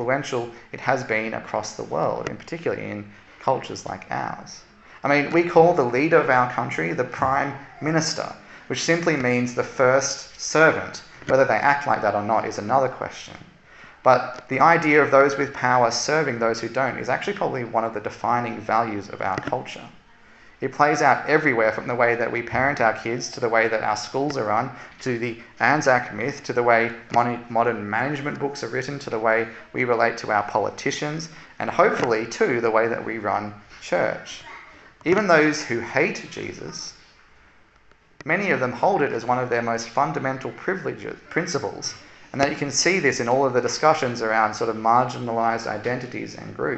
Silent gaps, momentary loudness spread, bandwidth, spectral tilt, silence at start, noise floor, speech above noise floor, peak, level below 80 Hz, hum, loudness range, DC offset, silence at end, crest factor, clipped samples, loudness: none; 14 LU; 8.4 kHz; -4.5 dB/octave; 0 s; -55 dBFS; 33 dB; -2 dBFS; -58 dBFS; none; 6 LU; under 0.1%; 0 s; 22 dB; under 0.1%; -22 LUFS